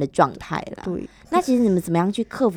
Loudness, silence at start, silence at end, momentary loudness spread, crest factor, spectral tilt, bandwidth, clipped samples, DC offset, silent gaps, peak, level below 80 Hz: -22 LUFS; 0 s; 0 s; 11 LU; 18 dB; -6.5 dB/octave; 17 kHz; under 0.1%; under 0.1%; none; -2 dBFS; -52 dBFS